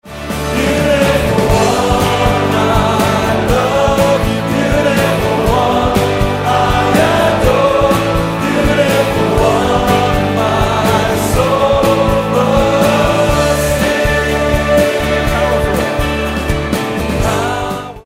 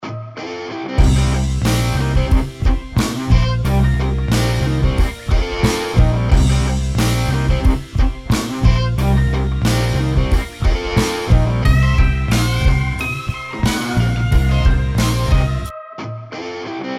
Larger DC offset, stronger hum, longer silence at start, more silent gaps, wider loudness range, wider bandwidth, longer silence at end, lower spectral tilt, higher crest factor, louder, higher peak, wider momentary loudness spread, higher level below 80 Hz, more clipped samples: neither; neither; about the same, 0.05 s vs 0 s; neither; about the same, 2 LU vs 1 LU; about the same, 16.5 kHz vs 15 kHz; about the same, 0.05 s vs 0 s; about the same, -5.5 dB/octave vs -6 dB/octave; about the same, 12 dB vs 14 dB; first, -12 LUFS vs -17 LUFS; about the same, 0 dBFS vs 0 dBFS; second, 4 LU vs 10 LU; second, -24 dBFS vs -18 dBFS; neither